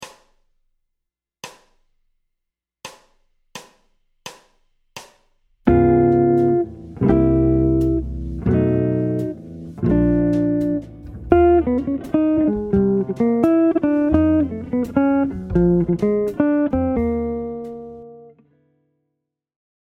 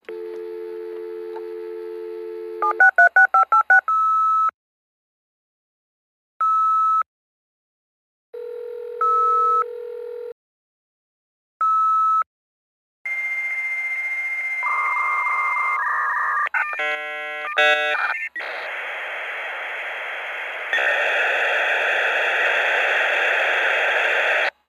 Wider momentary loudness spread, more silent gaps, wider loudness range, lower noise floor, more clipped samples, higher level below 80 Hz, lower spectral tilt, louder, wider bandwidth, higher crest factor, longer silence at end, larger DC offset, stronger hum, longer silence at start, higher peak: first, 23 LU vs 17 LU; second, none vs 4.54-6.40 s, 7.06-8.33 s, 10.32-11.60 s, 12.26-13.05 s; about the same, 5 LU vs 7 LU; second, -81 dBFS vs under -90 dBFS; neither; first, -34 dBFS vs -78 dBFS; first, -9 dB/octave vs 0.5 dB/octave; about the same, -18 LUFS vs -19 LUFS; second, 8.8 kHz vs 13.5 kHz; about the same, 20 dB vs 18 dB; first, 1.55 s vs 0.2 s; neither; neither; about the same, 0 s vs 0.1 s; first, 0 dBFS vs -4 dBFS